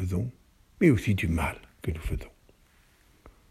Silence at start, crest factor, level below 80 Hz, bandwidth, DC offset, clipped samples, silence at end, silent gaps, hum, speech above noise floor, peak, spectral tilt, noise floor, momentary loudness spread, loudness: 0 s; 22 dB; -42 dBFS; 15.5 kHz; under 0.1%; under 0.1%; 0.2 s; none; none; 35 dB; -8 dBFS; -7 dB/octave; -61 dBFS; 15 LU; -28 LUFS